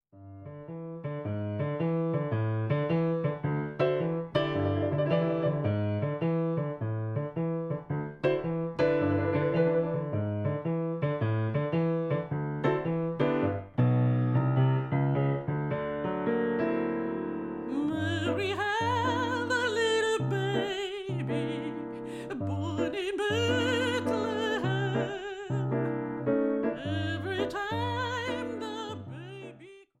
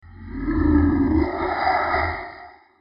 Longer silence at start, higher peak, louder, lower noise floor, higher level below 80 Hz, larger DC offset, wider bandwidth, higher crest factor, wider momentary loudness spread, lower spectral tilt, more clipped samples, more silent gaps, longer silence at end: about the same, 0.15 s vs 0.05 s; second, -14 dBFS vs -8 dBFS; second, -30 LUFS vs -21 LUFS; first, -51 dBFS vs -43 dBFS; second, -62 dBFS vs -32 dBFS; neither; first, 10 kHz vs 5.6 kHz; about the same, 16 dB vs 14 dB; second, 8 LU vs 17 LU; second, -7 dB/octave vs -10.5 dB/octave; neither; neither; about the same, 0.2 s vs 0.3 s